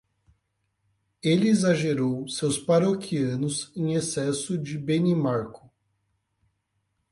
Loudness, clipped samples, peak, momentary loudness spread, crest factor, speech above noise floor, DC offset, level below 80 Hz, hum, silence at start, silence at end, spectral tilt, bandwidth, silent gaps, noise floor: -25 LUFS; under 0.1%; -10 dBFS; 8 LU; 18 dB; 51 dB; under 0.1%; -64 dBFS; none; 1.25 s; 1.6 s; -5.5 dB/octave; 11.5 kHz; none; -76 dBFS